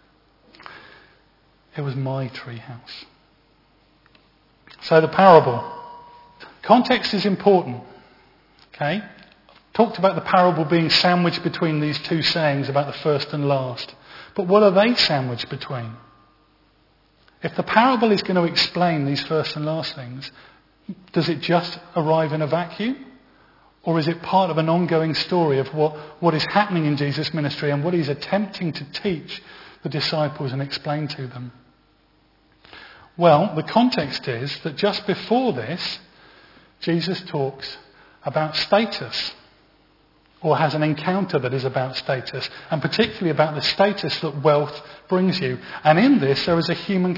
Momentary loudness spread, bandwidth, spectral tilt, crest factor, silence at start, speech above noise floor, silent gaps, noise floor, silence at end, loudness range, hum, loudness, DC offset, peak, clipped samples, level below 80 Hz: 17 LU; 5.8 kHz; -6.5 dB/octave; 22 dB; 0.65 s; 39 dB; none; -59 dBFS; 0 s; 7 LU; none; -21 LUFS; under 0.1%; 0 dBFS; under 0.1%; -60 dBFS